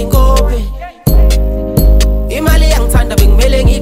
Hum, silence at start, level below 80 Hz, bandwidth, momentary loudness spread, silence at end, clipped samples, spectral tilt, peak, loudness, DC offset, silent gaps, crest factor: none; 0 s; -10 dBFS; 16 kHz; 6 LU; 0 s; under 0.1%; -5.5 dB/octave; 0 dBFS; -11 LUFS; under 0.1%; none; 8 dB